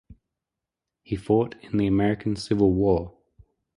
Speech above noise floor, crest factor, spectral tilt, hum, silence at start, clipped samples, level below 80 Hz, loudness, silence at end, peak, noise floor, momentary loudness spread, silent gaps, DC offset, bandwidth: 64 dB; 18 dB; -8 dB/octave; none; 0.1 s; under 0.1%; -46 dBFS; -24 LUFS; 0.7 s; -8 dBFS; -87 dBFS; 12 LU; none; under 0.1%; 11.5 kHz